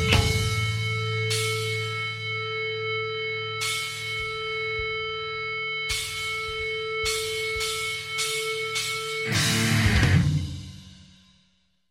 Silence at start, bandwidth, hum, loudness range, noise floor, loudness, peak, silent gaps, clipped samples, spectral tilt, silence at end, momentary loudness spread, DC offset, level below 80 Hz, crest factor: 0 s; 16 kHz; none; 4 LU; -67 dBFS; -26 LUFS; -6 dBFS; none; under 0.1%; -3.5 dB/octave; 0.85 s; 7 LU; under 0.1%; -42 dBFS; 22 dB